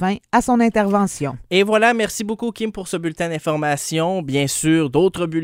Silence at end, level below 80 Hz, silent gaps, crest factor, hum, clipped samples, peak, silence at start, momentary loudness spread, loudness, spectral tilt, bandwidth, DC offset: 0 s; -48 dBFS; none; 16 dB; none; under 0.1%; -2 dBFS; 0 s; 9 LU; -19 LUFS; -4.5 dB/octave; 16 kHz; under 0.1%